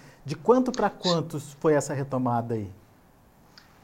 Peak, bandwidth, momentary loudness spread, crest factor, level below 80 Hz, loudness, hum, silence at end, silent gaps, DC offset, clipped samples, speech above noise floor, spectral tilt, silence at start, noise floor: -8 dBFS; 16 kHz; 12 LU; 20 dB; -58 dBFS; -26 LUFS; none; 1.1 s; none; under 0.1%; under 0.1%; 31 dB; -5.5 dB/octave; 0.05 s; -57 dBFS